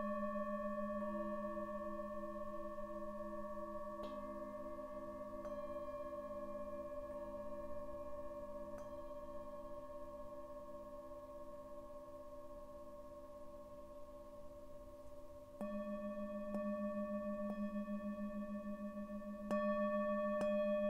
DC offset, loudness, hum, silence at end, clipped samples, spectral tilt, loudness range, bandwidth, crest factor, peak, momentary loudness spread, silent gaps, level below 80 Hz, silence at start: under 0.1%; -46 LUFS; none; 0 s; under 0.1%; -7.5 dB/octave; 11 LU; 15.5 kHz; 16 dB; -28 dBFS; 16 LU; none; -62 dBFS; 0 s